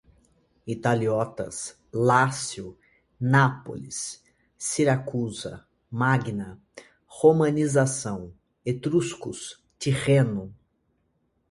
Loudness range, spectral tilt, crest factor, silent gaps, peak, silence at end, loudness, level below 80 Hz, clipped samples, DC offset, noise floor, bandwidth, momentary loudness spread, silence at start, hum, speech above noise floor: 3 LU; -5.5 dB/octave; 22 dB; none; -4 dBFS; 1 s; -25 LUFS; -58 dBFS; under 0.1%; under 0.1%; -71 dBFS; 11.5 kHz; 17 LU; 0.65 s; none; 47 dB